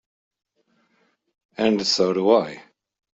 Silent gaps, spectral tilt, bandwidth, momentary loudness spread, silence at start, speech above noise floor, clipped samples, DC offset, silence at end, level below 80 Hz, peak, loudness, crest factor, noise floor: none; -4 dB/octave; 8 kHz; 20 LU; 1.6 s; 47 dB; under 0.1%; under 0.1%; 0.6 s; -66 dBFS; -4 dBFS; -20 LUFS; 20 dB; -67 dBFS